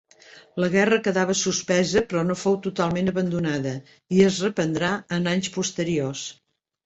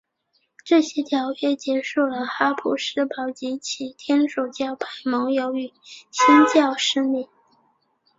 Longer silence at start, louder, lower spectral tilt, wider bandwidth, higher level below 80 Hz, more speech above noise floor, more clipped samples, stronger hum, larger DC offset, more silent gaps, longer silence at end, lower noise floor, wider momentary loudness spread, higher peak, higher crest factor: second, 0.35 s vs 0.65 s; about the same, -23 LUFS vs -22 LUFS; first, -4.5 dB/octave vs -2.5 dB/octave; about the same, 8.2 kHz vs 7.8 kHz; first, -56 dBFS vs -70 dBFS; second, 27 dB vs 48 dB; neither; neither; neither; neither; second, 0.5 s vs 0.95 s; second, -50 dBFS vs -69 dBFS; second, 8 LU vs 13 LU; about the same, -4 dBFS vs -2 dBFS; about the same, 20 dB vs 20 dB